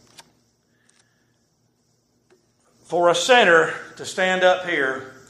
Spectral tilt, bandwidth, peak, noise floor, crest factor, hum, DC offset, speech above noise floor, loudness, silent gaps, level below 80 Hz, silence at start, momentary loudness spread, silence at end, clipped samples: -2.5 dB/octave; 13.5 kHz; -2 dBFS; -66 dBFS; 22 dB; none; under 0.1%; 47 dB; -18 LUFS; none; -72 dBFS; 2.9 s; 13 LU; 0.2 s; under 0.1%